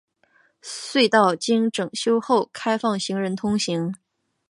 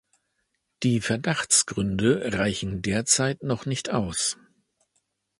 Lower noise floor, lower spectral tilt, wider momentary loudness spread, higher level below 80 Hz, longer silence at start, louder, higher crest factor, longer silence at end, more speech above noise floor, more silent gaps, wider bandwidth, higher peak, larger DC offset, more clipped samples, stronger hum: second, -62 dBFS vs -76 dBFS; about the same, -4.5 dB/octave vs -3.5 dB/octave; first, 14 LU vs 8 LU; second, -64 dBFS vs -50 dBFS; second, 0.65 s vs 0.8 s; about the same, -22 LUFS vs -24 LUFS; about the same, 20 dB vs 20 dB; second, 0.55 s vs 1.05 s; second, 40 dB vs 51 dB; neither; about the same, 11.5 kHz vs 11.5 kHz; first, -2 dBFS vs -6 dBFS; neither; neither; neither